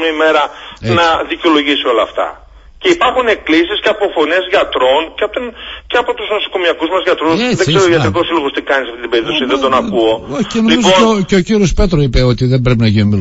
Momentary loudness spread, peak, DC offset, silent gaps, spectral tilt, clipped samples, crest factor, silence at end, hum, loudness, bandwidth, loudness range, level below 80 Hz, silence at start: 7 LU; 0 dBFS; under 0.1%; none; -5.5 dB/octave; under 0.1%; 12 dB; 0 s; none; -12 LUFS; 8 kHz; 2 LU; -28 dBFS; 0 s